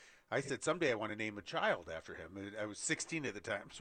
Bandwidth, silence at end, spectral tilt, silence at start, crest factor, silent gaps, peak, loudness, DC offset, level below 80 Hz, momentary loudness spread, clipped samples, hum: 9.6 kHz; 0 s; -3.5 dB/octave; 0 s; 20 dB; none; -20 dBFS; -39 LUFS; under 0.1%; -72 dBFS; 12 LU; under 0.1%; none